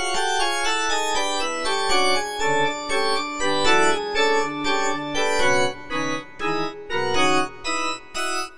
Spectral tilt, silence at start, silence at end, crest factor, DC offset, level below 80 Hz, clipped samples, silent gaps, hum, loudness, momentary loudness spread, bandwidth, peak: -2 dB/octave; 0 s; 0 s; 16 dB; 3%; -48 dBFS; under 0.1%; none; none; -22 LUFS; 7 LU; 10.5 kHz; -6 dBFS